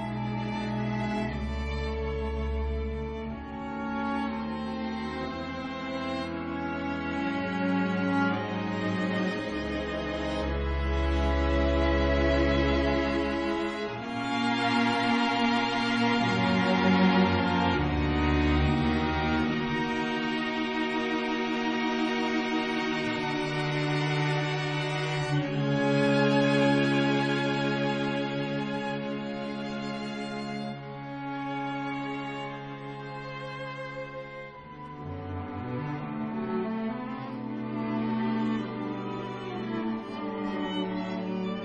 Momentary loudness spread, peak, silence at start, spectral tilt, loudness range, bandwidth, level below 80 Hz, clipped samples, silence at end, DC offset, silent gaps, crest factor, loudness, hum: 11 LU; -12 dBFS; 0 s; -6.5 dB/octave; 10 LU; 9.8 kHz; -40 dBFS; under 0.1%; 0 s; under 0.1%; none; 16 dB; -29 LUFS; none